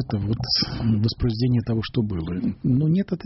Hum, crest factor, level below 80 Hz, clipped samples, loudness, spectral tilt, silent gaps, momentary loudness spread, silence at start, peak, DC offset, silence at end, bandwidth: none; 14 dB; -40 dBFS; under 0.1%; -23 LUFS; -6.5 dB/octave; none; 5 LU; 0 s; -10 dBFS; under 0.1%; 0 s; 6 kHz